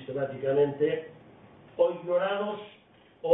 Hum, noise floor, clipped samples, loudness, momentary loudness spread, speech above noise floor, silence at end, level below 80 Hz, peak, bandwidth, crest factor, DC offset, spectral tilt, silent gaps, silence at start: none; -53 dBFS; under 0.1%; -29 LUFS; 17 LU; 25 dB; 0 s; -72 dBFS; -8 dBFS; 3.9 kHz; 20 dB; under 0.1%; -10 dB/octave; none; 0 s